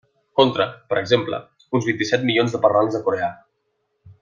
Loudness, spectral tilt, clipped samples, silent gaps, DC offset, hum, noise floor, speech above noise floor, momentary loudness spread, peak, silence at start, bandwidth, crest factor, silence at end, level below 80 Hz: -20 LUFS; -5.5 dB/octave; under 0.1%; none; under 0.1%; none; -72 dBFS; 52 dB; 8 LU; -2 dBFS; 0.35 s; 7.4 kHz; 20 dB; 0.1 s; -64 dBFS